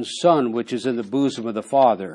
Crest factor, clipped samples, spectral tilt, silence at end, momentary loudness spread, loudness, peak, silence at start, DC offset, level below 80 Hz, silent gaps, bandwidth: 16 dB; under 0.1%; -5.5 dB/octave; 0 s; 7 LU; -21 LUFS; -4 dBFS; 0 s; under 0.1%; -76 dBFS; none; 11.5 kHz